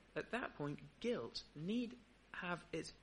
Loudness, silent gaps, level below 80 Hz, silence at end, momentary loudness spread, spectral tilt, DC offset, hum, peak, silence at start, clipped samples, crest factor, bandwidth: -46 LUFS; none; -70 dBFS; 0 s; 6 LU; -5.5 dB/octave; under 0.1%; none; -28 dBFS; 0 s; under 0.1%; 18 dB; 10.5 kHz